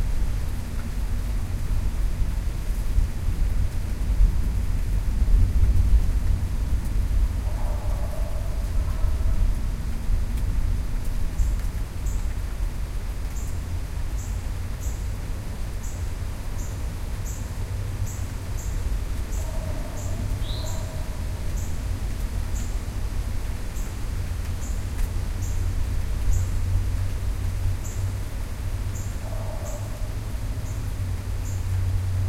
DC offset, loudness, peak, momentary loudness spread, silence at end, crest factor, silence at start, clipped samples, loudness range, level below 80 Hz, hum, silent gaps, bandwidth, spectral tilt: under 0.1%; -29 LUFS; -8 dBFS; 6 LU; 0 s; 16 dB; 0 s; under 0.1%; 7 LU; -26 dBFS; none; none; 15.5 kHz; -6 dB/octave